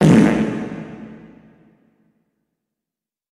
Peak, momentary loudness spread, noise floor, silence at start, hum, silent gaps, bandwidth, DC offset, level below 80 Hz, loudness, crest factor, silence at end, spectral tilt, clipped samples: 0 dBFS; 25 LU; -87 dBFS; 0 s; none; none; 11.5 kHz; under 0.1%; -48 dBFS; -17 LUFS; 20 dB; 2.2 s; -7.5 dB/octave; under 0.1%